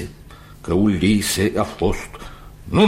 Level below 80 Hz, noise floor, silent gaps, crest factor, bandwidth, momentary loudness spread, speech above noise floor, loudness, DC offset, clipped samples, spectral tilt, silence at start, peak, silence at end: -36 dBFS; -41 dBFS; none; 16 dB; 16 kHz; 21 LU; 22 dB; -20 LUFS; under 0.1%; under 0.1%; -5 dB/octave; 0 s; -4 dBFS; 0 s